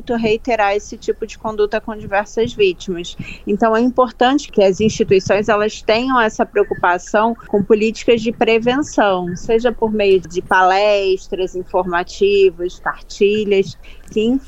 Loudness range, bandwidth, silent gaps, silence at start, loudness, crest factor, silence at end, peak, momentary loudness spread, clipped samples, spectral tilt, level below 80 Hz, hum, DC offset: 3 LU; 8.2 kHz; none; 0 s; -16 LUFS; 16 dB; 0 s; 0 dBFS; 10 LU; under 0.1%; -5 dB/octave; -38 dBFS; none; under 0.1%